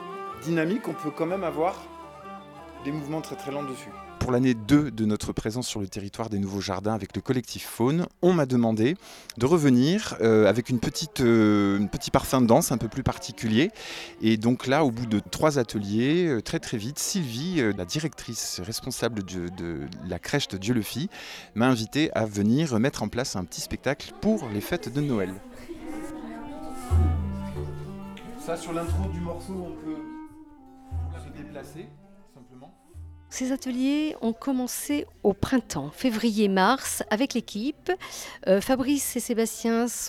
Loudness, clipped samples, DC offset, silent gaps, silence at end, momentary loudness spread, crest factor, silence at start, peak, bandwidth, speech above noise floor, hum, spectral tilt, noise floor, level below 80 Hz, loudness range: -26 LUFS; under 0.1%; under 0.1%; none; 0 s; 16 LU; 22 dB; 0 s; -4 dBFS; 16.5 kHz; 25 dB; none; -5.5 dB/octave; -51 dBFS; -48 dBFS; 10 LU